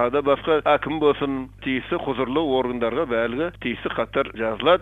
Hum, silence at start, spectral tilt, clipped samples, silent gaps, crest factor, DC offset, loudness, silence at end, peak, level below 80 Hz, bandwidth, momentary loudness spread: none; 0 s; -7.5 dB/octave; under 0.1%; none; 18 dB; under 0.1%; -23 LUFS; 0 s; -4 dBFS; -48 dBFS; 4.2 kHz; 7 LU